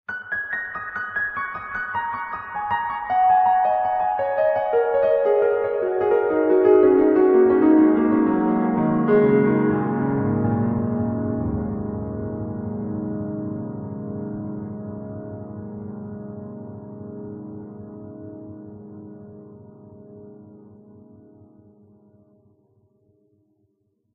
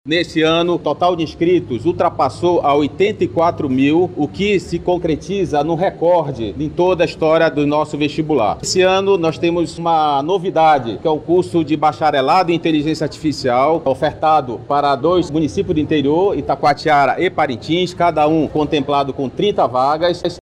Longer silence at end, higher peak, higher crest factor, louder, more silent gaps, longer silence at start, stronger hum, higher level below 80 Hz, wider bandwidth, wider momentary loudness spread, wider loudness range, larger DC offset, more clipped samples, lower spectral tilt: first, 3.55 s vs 0 s; about the same, -4 dBFS vs -4 dBFS; first, 18 dB vs 12 dB; second, -21 LUFS vs -16 LUFS; neither; about the same, 0.1 s vs 0.05 s; neither; second, -52 dBFS vs -44 dBFS; second, 4 kHz vs 10.5 kHz; first, 21 LU vs 5 LU; first, 20 LU vs 1 LU; neither; neither; first, -11.5 dB/octave vs -6 dB/octave